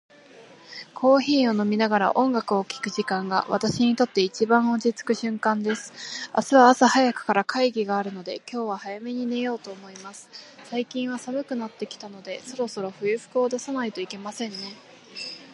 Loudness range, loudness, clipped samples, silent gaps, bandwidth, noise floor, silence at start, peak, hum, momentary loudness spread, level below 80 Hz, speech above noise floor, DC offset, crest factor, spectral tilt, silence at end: 10 LU; -24 LUFS; under 0.1%; none; 11.5 kHz; -49 dBFS; 0.35 s; -2 dBFS; none; 17 LU; -70 dBFS; 25 dB; under 0.1%; 22 dB; -4.5 dB/octave; 0 s